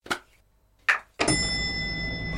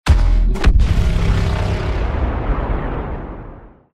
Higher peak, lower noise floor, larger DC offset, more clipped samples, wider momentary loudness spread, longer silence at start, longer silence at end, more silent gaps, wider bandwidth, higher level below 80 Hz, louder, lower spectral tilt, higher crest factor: second, -6 dBFS vs -2 dBFS; first, -62 dBFS vs -37 dBFS; neither; neither; second, 8 LU vs 13 LU; about the same, 0.05 s vs 0.05 s; second, 0 s vs 0.3 s; neither; first, 16.5 kHz vs 9.4 kHz; second, -42 dBFS vs -18 dBFS; second, -26 LUFS vs -19 LUFS; second, -3 dB/octave vs -7 dB/octave; first, 22 dB vs 14 dB